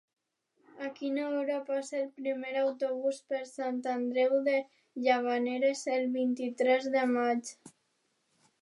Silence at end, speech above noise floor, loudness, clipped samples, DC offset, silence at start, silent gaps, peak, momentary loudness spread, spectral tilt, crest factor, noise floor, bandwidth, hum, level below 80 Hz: 0.95 s; 46 dB; -31 LUFS; under 0.1%; under 0.1%; 0.75 s; none; -14 dBFS; 9 LU; -3.5 dB/octave; 18 dB; -77 dBFS; 11.5 kHz; none; under -90 dBFS